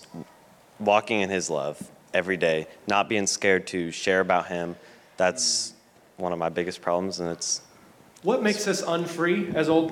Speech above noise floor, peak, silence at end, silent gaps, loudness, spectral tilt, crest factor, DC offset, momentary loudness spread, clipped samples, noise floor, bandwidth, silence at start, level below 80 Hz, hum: 29 dB; -6 dBFS; 0 s; none; -25 LUFS; -3.5 dB/octave; 20 dB; under 0.1%; 9 LU; under 0.1%; -54 dBFS; 17 kHz; 0 s; -66 dBFS; none